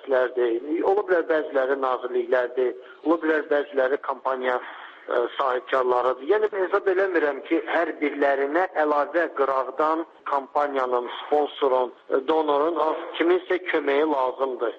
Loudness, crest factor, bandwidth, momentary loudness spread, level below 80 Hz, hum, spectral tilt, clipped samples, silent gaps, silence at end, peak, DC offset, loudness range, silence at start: -24 LUFS; 14 dB; 6.8 kHz; 5 LU; -72 dBFS; none; -5 dB/octave; under 0.1%; none; 0 s; -10 dBFS; under 0.1%; 2 LU; 0 s